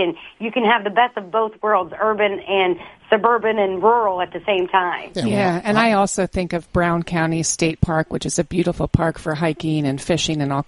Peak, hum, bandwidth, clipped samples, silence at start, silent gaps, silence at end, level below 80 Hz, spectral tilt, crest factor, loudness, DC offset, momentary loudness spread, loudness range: -2 dBFS; none; 11.5 kHz; under 0.1%; 0 s; none; 0.05 s; -40 dBFS; -5 dB/octave; 18 dB; -19 LUFS; under 0.1%; 6 LU; 2 LU